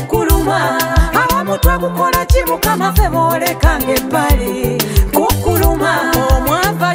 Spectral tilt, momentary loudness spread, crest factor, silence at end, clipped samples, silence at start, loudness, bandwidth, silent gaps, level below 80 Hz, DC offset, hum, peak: -5 dB/octave; 2 LU; 12 dB; 0 s; under 0.1%; 0 s; -14 LUFS; 16.5 kHz; none; -18 dBFS; under 0.1%; none; 0 dBFS